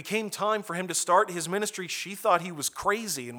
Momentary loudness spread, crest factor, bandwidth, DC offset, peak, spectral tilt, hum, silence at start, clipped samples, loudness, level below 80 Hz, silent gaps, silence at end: 7 LU; 20 dB; over 20 kHz; under 0.1%; -8 dBFS; -2.5 dB/octave; none; 0 s; under 0.1%; -28 LUFS; -66 dBFS; none; 0 s